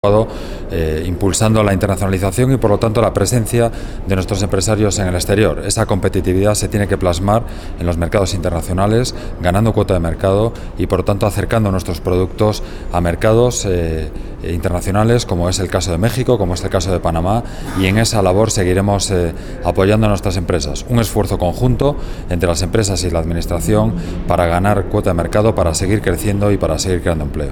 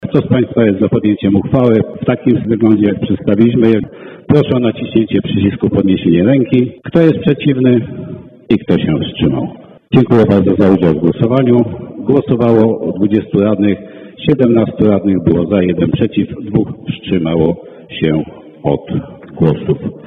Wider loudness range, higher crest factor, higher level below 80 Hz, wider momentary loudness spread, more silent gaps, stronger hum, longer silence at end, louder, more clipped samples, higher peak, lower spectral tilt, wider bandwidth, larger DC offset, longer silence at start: about the same, 2 LU vs 3 LU; about the same, 14 dB vs 12 dB; first, -26 dBFS vs -40 dBFS; second, 7 LU vs 10 LU; neither; neither; about the same, 0 s vs 0 s; second, -16 LUFS vs -13 LUFS; neither; about the same, 0 dBFS vs 0 dBFS; second, -5.5 dB/octave vs -10 dB/octave; first, 17.5 kHz vs 4.9 kHz; first, 0.4% vs under 0.1%; about the same, 0.05 s vs 0 s